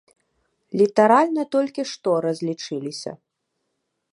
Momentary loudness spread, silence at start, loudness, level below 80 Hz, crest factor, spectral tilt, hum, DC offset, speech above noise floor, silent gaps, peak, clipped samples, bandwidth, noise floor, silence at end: 15 LU; 0.75 s; -21 LUFS; -76 dBFS; 20 dB; -5.5 dB/octave; none; under 0.1%; 56 dB; none; -2 dBFS; under 0.1%; 11 kHz; -77 dBFS; 0.95 s